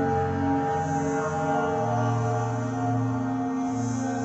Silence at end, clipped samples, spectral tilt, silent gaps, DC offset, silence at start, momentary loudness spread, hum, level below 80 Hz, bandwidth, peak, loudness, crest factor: 0 s; under 0.1%; -7 dB/octave; none; under 0.1%; 0 s; 3 LU; none; -58 dBFS; 8.4 kHz; -14 dBFS; -26 LUFS; 12 dB